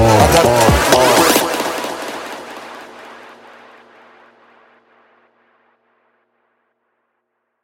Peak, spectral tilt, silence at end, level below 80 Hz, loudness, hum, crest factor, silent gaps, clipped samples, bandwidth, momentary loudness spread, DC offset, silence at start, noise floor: 0 dBFS; -4 dB/octave; 4.5 s; -32 dBFS; -12 LUFS; none; 18 dB; none; under 0.1%; 17 kHz; 24 LU; under 0.1%; 0 s; -71 dBFS